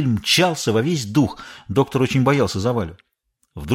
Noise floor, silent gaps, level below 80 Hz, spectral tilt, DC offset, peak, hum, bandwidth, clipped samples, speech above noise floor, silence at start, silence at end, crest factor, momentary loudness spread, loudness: -45 dBFS; none; -46 dBFS; -5 dB/octave; under 0.1%; -4 dBFS; none; 16.5 kHz; under 0.1%; 26 dB; 0 s; 0 s; 16 dB; 10 LU; -19 LUFS